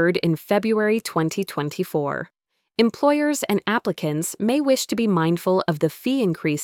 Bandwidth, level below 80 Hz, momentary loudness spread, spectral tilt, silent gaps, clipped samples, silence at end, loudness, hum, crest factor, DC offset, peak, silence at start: 19 kHz; -64 dBFS; 6 LU; -5.5 dB/octave; none; under 0.1%; 0 s; -22 LUFS; none; 18 dB; under 0.1%; -4 dBFS; 0 s